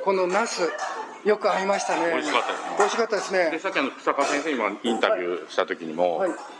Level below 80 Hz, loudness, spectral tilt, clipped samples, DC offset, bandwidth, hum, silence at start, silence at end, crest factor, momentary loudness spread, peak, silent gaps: -86 dBFS; -24 LUFS; -3 dB/octave; under 0.1%; under 0.1%; 11.5 kHz; none; 0 s; 0 s; 20 dB; 5 LU; -4 dBFS; none